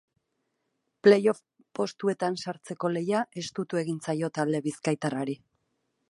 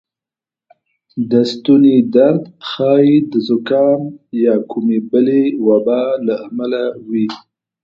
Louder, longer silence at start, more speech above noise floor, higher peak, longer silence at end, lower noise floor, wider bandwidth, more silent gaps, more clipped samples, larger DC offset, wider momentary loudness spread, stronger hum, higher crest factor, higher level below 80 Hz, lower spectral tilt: second, -28 LUFS vs -14 LUFS; about the same, 1.05 s vs 1.15 s; second, 52 dB vs 75 dB; second, -6 dBFS vs 0 dBFS; first, 0.75 s vs 0.45 s; second, -79 dBFS vs -89 dBFS; first, 11.5 kHz vs 7.4 kHz; neither; neither; neither; first, 13 LU vs 10 LU; neither; first, 22 dB vs 14 dB; second, -76 dBFS vs -62 dBFS; second, -6 dB/octave vs -8 dB/octave